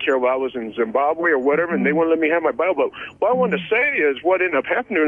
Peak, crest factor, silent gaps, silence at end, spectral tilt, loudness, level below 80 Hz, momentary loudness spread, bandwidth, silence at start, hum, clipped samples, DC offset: -8 dBFS; 12 dB; none; 0 s; -7.5 dB/octave; -19 LUFS; -64 dBFS; 5 LU; 7.2 kHz; 0 s; none; under 0.1%; under 0.1%